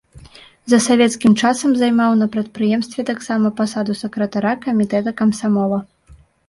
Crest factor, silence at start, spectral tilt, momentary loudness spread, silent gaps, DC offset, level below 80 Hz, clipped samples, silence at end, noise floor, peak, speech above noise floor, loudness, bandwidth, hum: 14 dB; 0.15 s; -5 dB/octave; 8 LU; none; under 0.1%; -54 dBFS; under 0.1%; 0.35 s; -48 dBFS; -2 dBFS; 32 dB; -17 LUFS; 11.5 kHz; none